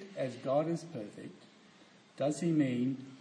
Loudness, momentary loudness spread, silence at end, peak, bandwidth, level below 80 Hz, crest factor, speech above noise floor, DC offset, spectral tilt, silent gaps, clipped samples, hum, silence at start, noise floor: -34 LUFS; 16 LU; 0 s; -18 dBFS; 10.5 kHz; -86 dBFS; 16 dB; 27 dB; under 0.1%; -7 dB/octave; none; under 0.1%; none; 0 s; -61 dBFS